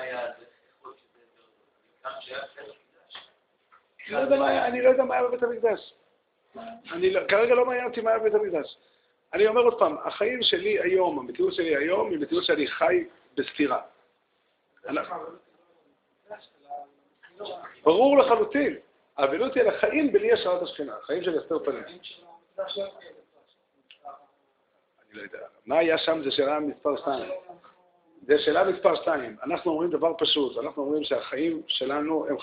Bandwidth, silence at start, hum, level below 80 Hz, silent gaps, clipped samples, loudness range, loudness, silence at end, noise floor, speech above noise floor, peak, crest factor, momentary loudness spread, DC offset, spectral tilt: 5.2 kHz; 0 s; none; -68 dBFS; none; under 0.1%; 15 LU; -25 LUFS; 0 s; -71 dBFS; 46 dB; -6 dBFS; 22 dB; 21 LU; under 0.1%; -1.5 dB/octave